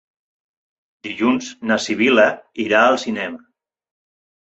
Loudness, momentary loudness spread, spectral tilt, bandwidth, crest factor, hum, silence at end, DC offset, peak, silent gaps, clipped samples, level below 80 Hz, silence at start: -17 LUFS; 16 LU; -4 dB/octave; 8.2 kHz; 18 dB; none; 1.15 s; under 0.1%; -2 dBFS; none; under 0.1%; -64 dBFS; 1.05 s